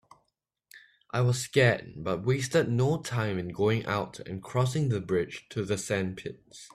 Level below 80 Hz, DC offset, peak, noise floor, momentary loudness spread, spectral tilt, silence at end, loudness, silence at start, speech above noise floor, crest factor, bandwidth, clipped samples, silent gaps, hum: -60 dBFS; under 0.1%; -10 dBFS; -80 dBFS; 10 LU; -5.5 dB/octave; 0.1 s; -29 LUFS; 0.75 s; 51 dB; 20 dB; 14 kHz; under 0.1%; none; none